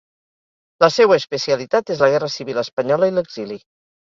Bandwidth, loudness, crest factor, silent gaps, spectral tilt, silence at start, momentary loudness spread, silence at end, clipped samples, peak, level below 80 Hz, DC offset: 7.4 kHz; -18 LUFS; 18 dB; 2.73-2.77 s; -4.5 dB/octave; 0.8 s; 14 LU; 0.55 s; under 0.1%; 0 dBFS; -64 dBFS; under 0.1%